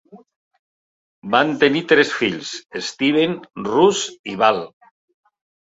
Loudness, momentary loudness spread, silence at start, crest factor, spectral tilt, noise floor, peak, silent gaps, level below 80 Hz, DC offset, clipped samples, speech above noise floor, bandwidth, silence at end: -18 LUFS; 13 LU; 0.15 s; 20 dB; -4 dB/octave; under -90 dBFS; -2 dBFS; 0.36-0.51 s, 0.59-1.22 s, 4.19-4.24 s; -62 dBFS; under 0.1%; under 0.1%; over 72 dB; 8 kHz; 1.05 s